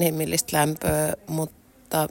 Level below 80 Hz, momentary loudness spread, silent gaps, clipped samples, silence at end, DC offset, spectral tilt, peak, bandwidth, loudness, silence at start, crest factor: -48 dBFS; 8 LU; none; under 0.1%; 0 s; under 0.1%; -4.5 dB/octave; -6 dBFS; 16.5 kHz; -25 LUFS; 0 s; 18 dB